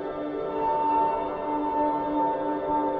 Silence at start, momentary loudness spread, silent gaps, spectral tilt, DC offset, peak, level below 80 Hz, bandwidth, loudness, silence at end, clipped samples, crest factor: 0 s; 6 LU; none; -8.5 dB/octave; under 0.1%; -14 dBFS; -54 dBFS; 4.8 kHz; -27 LUFS; 0 s; under 0.1%; 12 dB